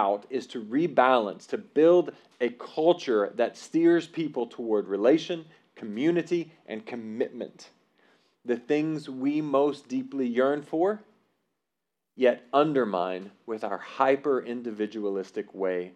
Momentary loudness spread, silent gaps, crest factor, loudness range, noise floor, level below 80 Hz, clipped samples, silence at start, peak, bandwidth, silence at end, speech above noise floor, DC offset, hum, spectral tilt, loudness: 14 LU; none; 20 dB; 6 LU; -85 dBFS; under -90 dBFS; under 0.1%; 0 s; -6 dBFS; 9.2 kHz; 0.05 s; 59 dB; under 0.1%; none; -6.5 dB/octave; -27 LUFS